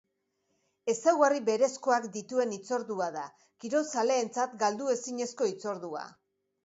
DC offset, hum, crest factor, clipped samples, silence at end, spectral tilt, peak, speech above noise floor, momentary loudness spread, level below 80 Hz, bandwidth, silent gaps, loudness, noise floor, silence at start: under 0.1%; none; 22 dB; under 0.1%; 0.55 s; -3.5 dB/octave; -10 dBFS; 48 dB; 13 LU; -82 dBFS; 8 kHz; none; -30 LUFS; -78 dBFS; 0.85 s